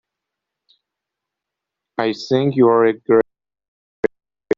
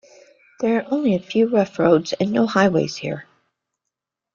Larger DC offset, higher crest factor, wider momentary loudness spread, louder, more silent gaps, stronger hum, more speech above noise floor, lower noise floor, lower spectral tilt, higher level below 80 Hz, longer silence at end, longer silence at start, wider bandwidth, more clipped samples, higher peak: neither; about the same, 18 dB vs 18 dB; about the same, 11 LU vs 9 LU; about the same, -18 LUFS vs -20 LUFS; first, 3.68-4.03 s vs none; neither; first, 68 dB vs 64 dB; about the same, -83 dBFS vs -83 dBFS; about the same, -5.5 dB/octave vs -6.5 dB/octave; about the same, -60 dBFS vs -60 dBFS; second, 0.05 s vs 1.15 s; first, 2 s vs 0.6 s; about the same, 7.2 kHz vs 7.4 kHz; neither; about the same, -2 dBFS vs -4 dBFS